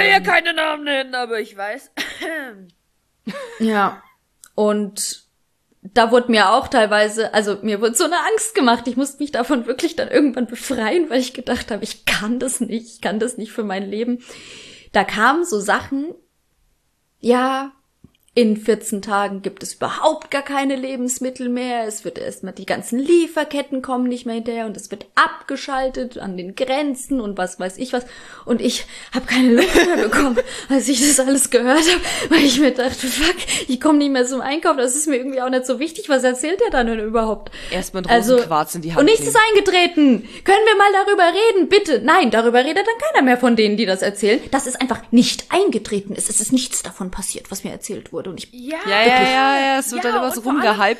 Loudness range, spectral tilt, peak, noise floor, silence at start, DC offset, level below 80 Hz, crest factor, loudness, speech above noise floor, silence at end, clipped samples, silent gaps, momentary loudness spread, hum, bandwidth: 8 LU; -3 dB/octave; 0 dBFS; -65 dBFS; 0 s; under 0.1%; -44 dBFS; 18 dB; -18 LUFS; 47 dB; 0 s; under 0.1%; none; 14 LU; none; 14 kHz